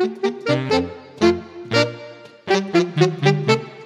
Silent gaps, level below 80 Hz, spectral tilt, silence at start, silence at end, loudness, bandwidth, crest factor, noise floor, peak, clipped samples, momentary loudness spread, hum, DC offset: none; -54 dBFS; -6 dB/octave; 0 s; 0 s; -20 LUFS; 11.5 kHz; 18 dB; -39 dBFS; -2 dBFS; under 0.1%; 12 LU; none; under 0.1%